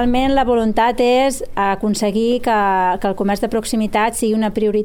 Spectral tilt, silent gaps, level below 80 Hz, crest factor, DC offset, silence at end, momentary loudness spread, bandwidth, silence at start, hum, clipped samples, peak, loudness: -4.5 dB/octave; none; -34 dBFS; 12 dB; under 0.1%; 0 s; 4 LU; 17.5 kHz; 0 s; none; under 0.1%; -4 dBFS; -17 LUFS